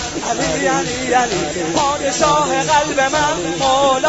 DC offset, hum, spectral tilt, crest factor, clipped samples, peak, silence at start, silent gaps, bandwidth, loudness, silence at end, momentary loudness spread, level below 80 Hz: 0.2%; none; -3 dB/octave; 14 dB; under 0.1%; -2 dBFS; 0 s; none; 8 kHz; -16 LUFS; 0 s; 4 LU; -40 dBFS